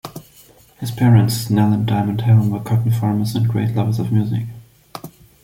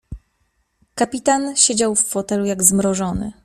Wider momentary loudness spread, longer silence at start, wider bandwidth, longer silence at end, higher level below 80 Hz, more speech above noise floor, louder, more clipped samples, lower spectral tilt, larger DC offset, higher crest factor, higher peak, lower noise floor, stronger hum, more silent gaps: first, 21 LU vs 9 LU; about the same, 0.05 s vs 0.1 s; about the same, 16 kHz vs 15.5 kHz; first, 0.35 s vs 0.1 s; second, -50 dBFS vs -44 dBFS; second, 32 dB vs 48 dB; about the same, -17 LUFS vs -17 LUFS; neither; first, -7 dB/octave vs -3 dB/octave; neither; second, 14 dB vs 20 dB; about the same, -2 dBFS vs 0 dBFS; second, -48 dBFS vs -66 dBFS; neither; neither